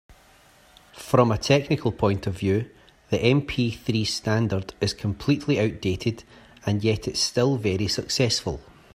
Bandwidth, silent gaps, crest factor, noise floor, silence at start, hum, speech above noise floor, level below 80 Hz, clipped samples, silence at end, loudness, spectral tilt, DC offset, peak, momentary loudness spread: 15.5 kHz; none; 20 dB; -55 dBFS; 0.1 s; none; 31 dB; -50 dBFS; under 0.1%; 0.35 s; -24 LUFS; -5.5 dB/octave; under 0.1%; -4 dBFS; 8 LU